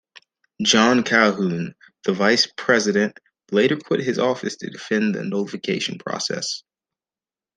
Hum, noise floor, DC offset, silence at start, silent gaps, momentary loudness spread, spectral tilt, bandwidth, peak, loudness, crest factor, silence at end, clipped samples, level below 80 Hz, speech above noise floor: none; under -90 dBFS; under 0.1%; 0.6 s; none; 12 LU; -3.5 dB/octave; 10 kHz; -2 dBFS; -20 LUFS; 20 dB; 0.95 s; under 0.1%; -66 dBFS; over 70 dB